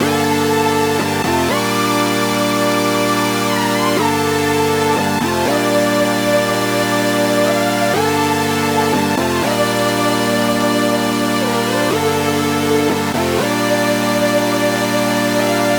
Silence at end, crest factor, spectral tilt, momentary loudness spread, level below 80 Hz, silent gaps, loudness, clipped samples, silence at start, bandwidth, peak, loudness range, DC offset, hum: 0 s; 14 dB; -4 dB/octave; 1 LU; -50 dBFS; none; -15 LUFS; under 0.1%; 0 s; over 20 kHz; -2 dBFS; 1 LU; 0.1%; none